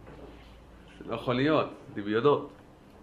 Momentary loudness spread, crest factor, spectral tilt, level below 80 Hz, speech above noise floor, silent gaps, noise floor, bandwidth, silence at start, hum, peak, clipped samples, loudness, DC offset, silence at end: 23 LU; 20 dB; -7.5 dB/octave; -56 dBFS; 23 dB; none; -51 dBFS; 10.5 kHz; 0 s; none; -10 dBFS; under 0.1%; -29 LUFS; under 0.1%; 0.5 s